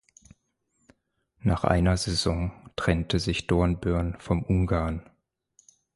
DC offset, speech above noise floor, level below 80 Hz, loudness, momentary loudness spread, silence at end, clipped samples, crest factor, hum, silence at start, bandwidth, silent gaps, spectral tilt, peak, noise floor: under 0.1%; 49 dB; -36 dBFS; -26 LUFS; 8 LU; 0.95 s; under 0.1%; 20 dB; none; 1.45 s; 11.5 kHz; none; -6 dB/octave; -6 dBFS; -74 dBFS